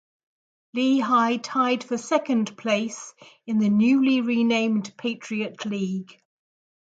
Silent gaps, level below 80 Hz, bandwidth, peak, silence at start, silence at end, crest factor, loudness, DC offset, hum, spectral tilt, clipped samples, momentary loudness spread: none; -74 dBFS; 9 kHz; -6 dBFS; 0.75 s; 0.8 s; 18 dB; -23 LUFS; under 0.1%; none; -5 dB/octave; under 0.1%; 12 LU